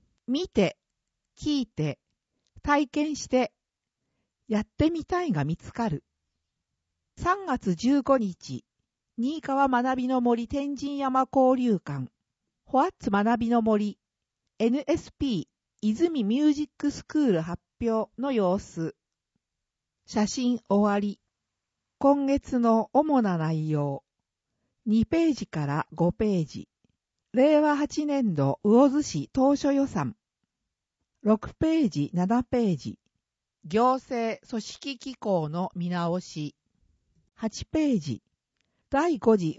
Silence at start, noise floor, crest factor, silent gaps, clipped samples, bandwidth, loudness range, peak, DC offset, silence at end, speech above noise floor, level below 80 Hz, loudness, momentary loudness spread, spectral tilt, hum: 0.3 s; -86 dBFS; 18 dB; none; under 0.1%; 8 kHz; 5 LU; -8 dBFS; under 0.1%; 0.05 s; 61 dB; -54 dBFS; -26 LUFS; 12 LU; -6.5 dB/octave; none